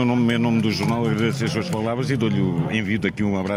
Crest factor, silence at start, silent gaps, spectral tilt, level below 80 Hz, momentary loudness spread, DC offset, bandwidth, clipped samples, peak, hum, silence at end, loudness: 14 dB; 0 s; none; -6.5 dB/octave; -52 dBFS; 4 LU; under 0.1%; 15.5 kHz; under 0.1%; -8 dBFS; none; 0 s; -22 LUFS